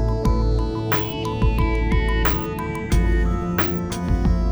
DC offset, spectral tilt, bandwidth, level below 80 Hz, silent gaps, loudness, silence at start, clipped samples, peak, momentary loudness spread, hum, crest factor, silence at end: under 0.1%; -6.5 dB/octave; over 20 kHz; -22 dBFS; none; -22 LUFS; 0 s; under 0.1%; -4 dBFS; 4 LU; none; 16 dB; 0 s